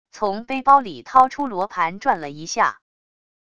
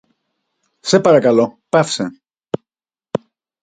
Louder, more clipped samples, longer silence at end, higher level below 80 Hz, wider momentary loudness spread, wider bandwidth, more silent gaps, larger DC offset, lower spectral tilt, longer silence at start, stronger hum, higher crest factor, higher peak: second, -20 LUFS vs -17 LUFS; neither; first, 0.8 s vs 0.45 s; about the same, -58 dBFS vs -60 dBFS; second, 10 LU vs 16 LU; about the same, 8.6 kHz vs 9.4 kHz; neither; first, 0.5% vs under 0.1%; about the same, -4 dB/octave vs -5 dB/octave; second, 0.15 s vs 0.85 s; neither; about the same, 20 dB vs 18 dB; about the same, 0 dBFS vs 0 dBFS